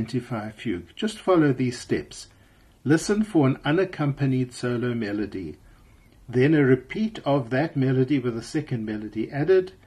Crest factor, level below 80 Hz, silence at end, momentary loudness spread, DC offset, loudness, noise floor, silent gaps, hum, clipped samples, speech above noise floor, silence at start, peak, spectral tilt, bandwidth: 16 dB; -54 dBFS; 0.15 s; 11 LU; under 0.1%; -24 LUFS; -55 dBFS; none; none; under 0.1%; 32 dB; 0 s; -8 dBFS; -7 dB/octave; 12.5 kHz